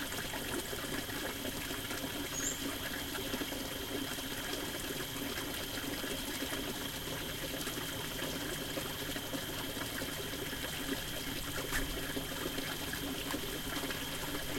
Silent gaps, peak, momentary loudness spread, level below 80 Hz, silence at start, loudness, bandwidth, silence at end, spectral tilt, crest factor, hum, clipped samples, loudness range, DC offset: none; -22 dBFS; 2 LU; -52 dBFS; 0 s; -38 LUFS; 16.5 kHz; 0 s; -2.5 dB/octave; 18 dB; none; under 0.1%; 1 LU; under 0.1%